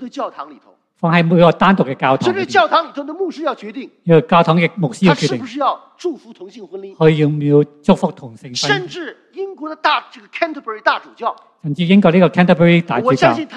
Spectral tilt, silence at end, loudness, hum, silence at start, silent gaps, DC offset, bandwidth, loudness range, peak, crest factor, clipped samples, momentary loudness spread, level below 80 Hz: -6.5 dB/octave; 0 s; -15 LUFS; none; 0 s; none; under 0.1%; 9.6 kHz; 5 LU; 0 dBFS; 16 dB; under 0.1%; 17 LU; -50 dBFS